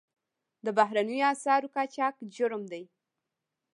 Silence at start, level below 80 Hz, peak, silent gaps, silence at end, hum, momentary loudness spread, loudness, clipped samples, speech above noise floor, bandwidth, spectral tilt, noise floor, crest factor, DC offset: 0.65 s; -88 dBFS; -10 dBFS; none; 0.95 s; none; 12 LU; -29 LUFS; under 0.1%; 58 dB; 11 kHz; -4 dB/octave; -86 dBFS; 22 dB; under 0.1%